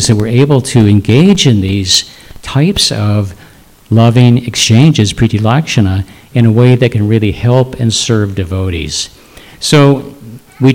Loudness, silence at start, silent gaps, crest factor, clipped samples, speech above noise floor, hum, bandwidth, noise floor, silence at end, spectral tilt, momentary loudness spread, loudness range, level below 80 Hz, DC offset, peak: -10 LUFS; 0 s; none; 10 dB; 2%; 30 dB; none; 16 kHz; -39 dBFS; 0 s; -5.5 dB/octave; 10 LU; 3 LU; -36 dBFS; under 0.1%; 0 dBFS